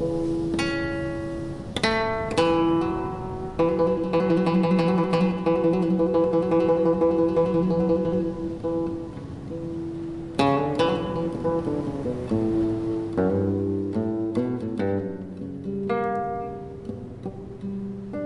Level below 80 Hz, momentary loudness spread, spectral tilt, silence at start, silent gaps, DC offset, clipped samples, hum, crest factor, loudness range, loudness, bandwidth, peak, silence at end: -46 dBFS; 13 LU; -7.5 dB/octave; 0 s; none; under 0.1%; under 0.1%; none; 16 dB; 6 LU; -25 LUFS; 11 kHz; -8 dBFS; 0 s